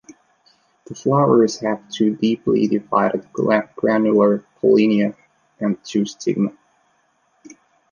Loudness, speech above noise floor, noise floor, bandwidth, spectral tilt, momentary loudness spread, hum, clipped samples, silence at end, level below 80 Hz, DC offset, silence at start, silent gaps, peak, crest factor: -19 LUFS; 45 dB; -63 dBFS; 7.4 kHz; -6.5 dB/octave; 9 LU; none; under 0.1%; 1.4 s; -64 dBFS; under 0.1%; 0.9 s; none; -2 dBFS; 18 dB